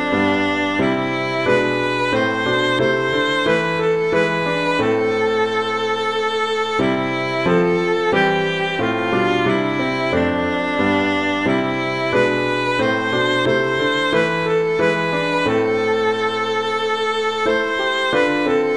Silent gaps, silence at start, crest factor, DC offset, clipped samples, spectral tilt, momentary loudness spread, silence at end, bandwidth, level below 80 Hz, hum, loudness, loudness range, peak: none; 0 s; 14 dB; 0.4%; under 0.1%; -5.5 dB/octave; 3 LU; 0 s; 11 kHz; -52 dBFS; none; -18 LUFS; 1 LU; -4 dBFS